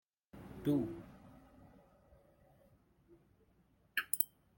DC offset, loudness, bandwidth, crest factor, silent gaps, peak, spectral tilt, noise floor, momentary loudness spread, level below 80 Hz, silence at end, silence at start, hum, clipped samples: under 0.1%; -38 LUFS; 16.5 kHz; 34 dB; none; -10 dBFS; -4.5 dB/octave; -72 dBFS; 26 LU; -68 dBFS; 0.3 s; 0.35 s; none; under 0.1%